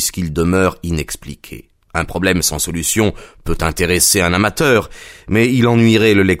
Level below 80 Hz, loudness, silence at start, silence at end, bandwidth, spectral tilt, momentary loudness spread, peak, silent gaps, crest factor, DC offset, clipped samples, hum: -32 dBFS; -14 LUFS; 0 s; 0 s; 16.5 kHz; -4 dB/octave; 17 LU; 0 dBFS; none; 16 dB; under 0.1%; under 0.1%; none